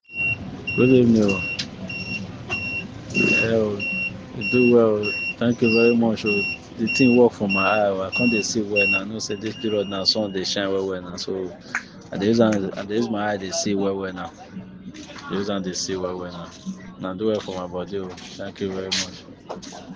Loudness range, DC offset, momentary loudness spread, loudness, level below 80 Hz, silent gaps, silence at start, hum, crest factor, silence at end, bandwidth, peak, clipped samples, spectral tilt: 9 LU; under 0.1%; 18 LU; -22 LUFS; -56 dBFS; none; 0.1 s; none; 20 dB; 0 s; 9.8 kHz; -4 dBFS; under 0.1%; -4.5 dB/octave